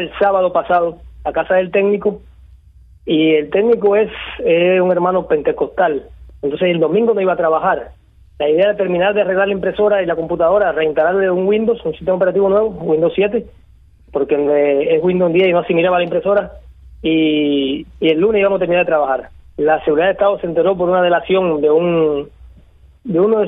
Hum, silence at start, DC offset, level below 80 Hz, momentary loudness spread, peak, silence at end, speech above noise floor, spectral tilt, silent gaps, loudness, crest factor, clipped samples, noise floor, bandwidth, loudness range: none; 0 s; under 0.1%; -44 dBFS; 8 LU; -2 dBFS; 0 s; 31 dB; -9.5 dB/octave; none; -15 LUFS; 12 dB; under 0.1%; -46 dBFS; 3.9 kHz; 2 LU